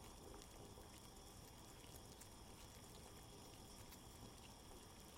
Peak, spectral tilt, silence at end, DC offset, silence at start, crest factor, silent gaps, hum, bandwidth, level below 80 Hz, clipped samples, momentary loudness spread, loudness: -36 dBFS; -3.5 dB/octave; 0 s; under 0.1%; 0 s; 24 dB; none; none; 16.5 kHz; -68 dBFS; under 0.1%; 1 LU; -60 LUFS